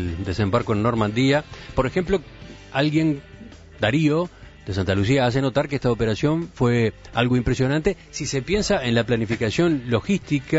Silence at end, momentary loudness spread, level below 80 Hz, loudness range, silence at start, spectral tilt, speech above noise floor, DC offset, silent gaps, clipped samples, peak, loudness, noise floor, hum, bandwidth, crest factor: 0 s; 7 LU; -40 dBFS; 2 LU; 0 s; -6 dB/octave; 21 dB; under 0.1%; none; under 0.1%; -4 dBFS; -22 LUFS; -42 dBFS; none; 8 kHz; 16 dB